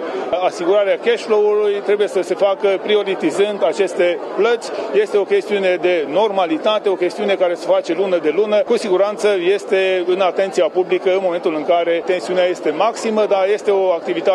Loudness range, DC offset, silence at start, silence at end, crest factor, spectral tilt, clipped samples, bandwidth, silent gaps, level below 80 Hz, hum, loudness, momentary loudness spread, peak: 1 LU; under 0.1%; 0 s; 0 s; 12 dB; -4.5 dB/octave; under 0.1%; 11.5 kHz; none; -72 dBFS; none; -17 LUFS; 3 LU; -4 dBFS